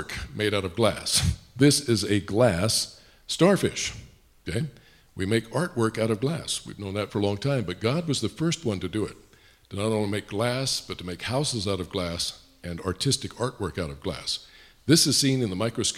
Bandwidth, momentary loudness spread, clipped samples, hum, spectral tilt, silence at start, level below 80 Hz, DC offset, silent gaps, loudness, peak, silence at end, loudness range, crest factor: 16 kHz; 12 LU; under 0.1%; none; -4 dB/octave; 0 s; -48 dBFS; under 0.1%; none; -26 LUFS; -6 dBFS; 0 s; 5 LU; 20 dB